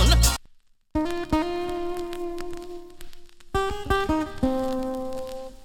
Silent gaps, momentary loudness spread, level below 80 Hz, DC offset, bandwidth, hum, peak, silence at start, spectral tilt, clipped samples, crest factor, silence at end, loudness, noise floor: none; 13 LU; -30 dBFS; under 0.1%; 17 kHz; none; -6 dBFS; 0 s; -4.5 dB/octave; under 0.1%; 18 dB; 0 s; -27 LUFS; -54 dBFS